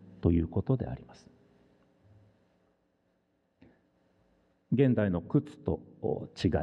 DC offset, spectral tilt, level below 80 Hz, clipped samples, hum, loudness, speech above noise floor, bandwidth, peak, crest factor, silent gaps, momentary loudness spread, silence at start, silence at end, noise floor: under 0.1%; -9 dB/octave; -50 dBFS; under 0.1%; none; -31 LUFS; 45 dB; 8.8 kHz; -12 dBFS; 22 dB; none; 10 LU; 0 s; 0 s; -74 dBFS